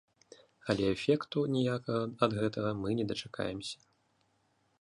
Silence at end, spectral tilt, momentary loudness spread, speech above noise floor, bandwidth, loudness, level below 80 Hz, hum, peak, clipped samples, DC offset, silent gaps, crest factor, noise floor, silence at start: 1.05 s; -6.5 dB/octave; 9 LU; 42 dB; 11.5 kHz; -33 LUFS; -62 dBFS; none; -12 dBFS; under 0.1%; under 0.1%; none; 22 dB; -74 dBFS; 0.65 s